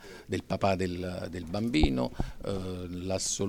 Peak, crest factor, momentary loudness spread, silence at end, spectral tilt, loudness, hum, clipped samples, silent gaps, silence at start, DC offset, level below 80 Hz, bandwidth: -10 dBFS; 22 dB; 10 LU; 0 s; -5 dB/octave; -32 LUFS; none; under 0.1%; none; 0 s; under 0.1%; -40 dBFS; 18 kHz